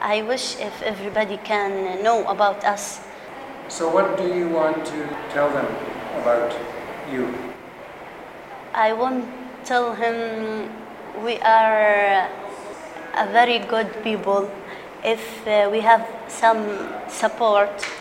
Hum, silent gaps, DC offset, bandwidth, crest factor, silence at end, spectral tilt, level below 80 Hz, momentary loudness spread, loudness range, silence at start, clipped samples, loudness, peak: none; none; under 0.1%; 16 kHz; 20 dB; 0 s; -3.5 dB/octave; -60 dBFS; 18 LU; 6 LU; 0 s; under 0.1%; -21 LUFS; -2 dBFS